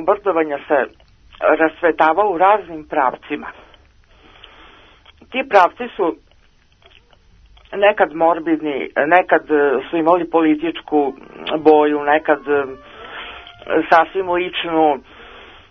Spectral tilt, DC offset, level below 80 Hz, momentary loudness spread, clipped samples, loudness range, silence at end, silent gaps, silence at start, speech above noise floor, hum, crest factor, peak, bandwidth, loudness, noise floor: -6.5 dB/octave; under 0.1%; -52 dBFS; 14 LU; under 0.1%; 6 LU; 0.25 s; none; 0 s; 36 dB; none; 18 dB; 0 dBFS; 6.4 kHz; -17 LUFS; -53 dBFS